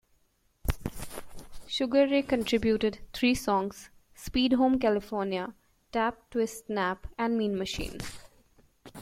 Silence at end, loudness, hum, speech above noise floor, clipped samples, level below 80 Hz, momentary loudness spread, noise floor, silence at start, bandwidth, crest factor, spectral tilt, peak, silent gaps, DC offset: 0 s; -29 LUFS; none; 41 dB; under 0.1%; -46 dBFS; 16 LU; -69 dBFS; 0.65 s; 16.5 kHz; 18 dB; -5 dB/octave; -12 dBFS; none; under 0.1%